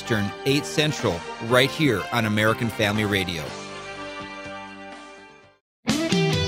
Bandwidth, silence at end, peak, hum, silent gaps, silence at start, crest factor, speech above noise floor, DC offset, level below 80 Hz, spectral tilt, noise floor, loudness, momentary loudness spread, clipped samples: 16 kHz; 0 s; -4 dBFS; none; 5.61-5.83 s; 0 s; 22 dB; 25 dB; under 0.1%; -52 dBFS; -4.5 dB/octave; -47 dBFS; -23 LUFS; 16 LU; under 0.1%